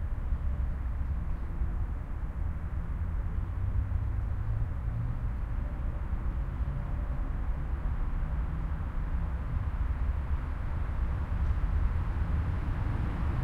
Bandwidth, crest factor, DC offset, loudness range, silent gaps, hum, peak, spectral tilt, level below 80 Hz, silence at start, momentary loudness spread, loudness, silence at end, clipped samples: 4.4 kHz; 14 dB; under 0.1%; 3 LU; none; none; -16 dBFS; -9 dB/octave; -32 dBFS; 0 s; 4 LU; -35 LUFS; 0 s; under 0.1%